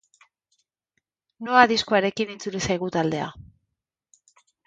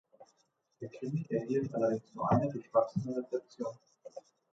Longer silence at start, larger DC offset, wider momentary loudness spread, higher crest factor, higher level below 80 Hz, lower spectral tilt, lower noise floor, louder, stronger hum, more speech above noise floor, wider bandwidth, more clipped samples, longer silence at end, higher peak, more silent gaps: first, 1.4 s vs 0.2 s; neither; second, 13 LU vs 20 LU; first, 26 dB vs 20 dB; first, -58 dBFS vs -64 dBFS; second, -4 dB/octave vs -9 dB/octave; first, -81 dBFS vs -76 dBFS; first, -22 LUFS vs -34 LUFS; neither; first, 59 dB vs 42 dB; first, 9.2 kHz vs 7.8 kHz; neither; first, 1.25 s vs 0.35 s; first, 0 dBFS vs -14 dBFS; neither